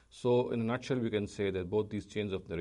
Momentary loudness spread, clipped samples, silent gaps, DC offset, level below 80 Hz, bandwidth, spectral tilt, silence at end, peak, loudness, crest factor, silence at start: 7 LU; under 0.1%; none; under 0.1%; -62 dBFS; 11 kHz; -7 dB/octave; 0 s; -20 dBFS; -34 LUFS; 14 dB; 0.15 s